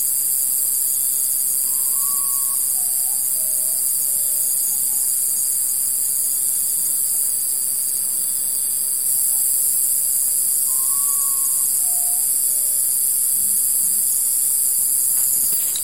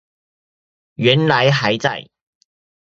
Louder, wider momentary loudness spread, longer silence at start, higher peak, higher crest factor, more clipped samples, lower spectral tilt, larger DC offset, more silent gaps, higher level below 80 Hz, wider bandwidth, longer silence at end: about the same, -16 LUFS vs -16 LUFS; second, 2 LU vs 8 LU; second, 0 s vs 1 s; second, -4 dBFS vs 0 dBFS; second, 14 dB vs 20 dB; neither; second, 2 dB/octave vs -5.5 dB/octave; first, 0.6% vs under 0.1%; neither; second, -64 dBFS vs -58 dBFS; first, 16.5 kHz vs 7.8 kHz; second, 0 s vs 0.95 s